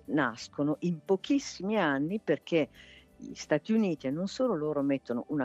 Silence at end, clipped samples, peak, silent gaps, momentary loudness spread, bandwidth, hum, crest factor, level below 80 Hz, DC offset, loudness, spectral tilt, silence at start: 0 s; under 0.1%; -12 dBFS; none; 5 LU; 8.2 kHz; none; 18 dB; -68 dBFS; under 0.1%; -31 LUFS; -6 dB/octave; 0.1 s